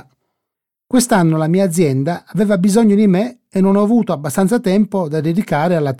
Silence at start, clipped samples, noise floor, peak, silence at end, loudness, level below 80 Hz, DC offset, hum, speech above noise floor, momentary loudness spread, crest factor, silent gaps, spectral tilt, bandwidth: 0.9 s; under 0.1%; -81 dBFS; -2 dBFS; 0.05 s; -15 LUFS; -52 dBFS; 0.3%; none; 67 dB; 6 LU; 12 dB; none; -6.5 dB/octave; 15.5 kHz